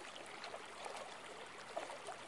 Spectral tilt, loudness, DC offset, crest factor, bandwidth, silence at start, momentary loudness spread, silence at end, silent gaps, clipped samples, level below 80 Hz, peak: -1.5 dB/octave; -49 LUFS; under 0.1%; 20 dB; 11.5 kHz; 0 s; 4 LU; 0 s; none; under 0.1%; -84 dBFS; -30 dBFS